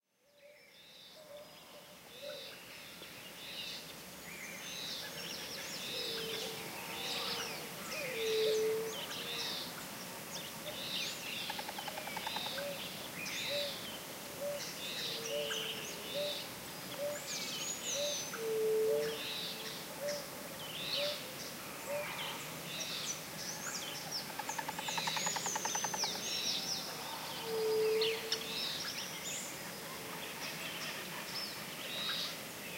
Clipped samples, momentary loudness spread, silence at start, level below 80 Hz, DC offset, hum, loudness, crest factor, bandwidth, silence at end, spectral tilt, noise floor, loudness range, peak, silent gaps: under 0.1%; 11 LU; 0.35 s; -74 dBFS; under 0.1%; none; -38 LUFS; 20 dB; 16 kHz; 0 s; -1.5 dB/octave; -64 dBFS; 7 LU; -20 dBFS; none